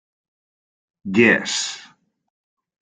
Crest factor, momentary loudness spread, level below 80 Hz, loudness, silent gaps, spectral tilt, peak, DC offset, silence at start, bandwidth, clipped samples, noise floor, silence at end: 22 dB; 22 LU; -64 dBFS; -18 LUFS; none; -3.5 dB/octave; -2 dBFS; under 0.1%; 1.05 s; 9.6 kHz; under 0.1%; under -90 dBFS; 1 s